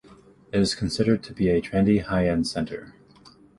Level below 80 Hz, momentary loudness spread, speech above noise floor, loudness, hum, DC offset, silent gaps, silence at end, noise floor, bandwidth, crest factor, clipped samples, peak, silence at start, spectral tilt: -44 dBFS; 8 LU; 30 dB; -24 LUFS; none; under 0.1%; none; 0.65 s; -53 dBFS; 11.5 kHz; 18 dB; under 0.1%; -8 dBFS; 0.1 s; -6 dB/octave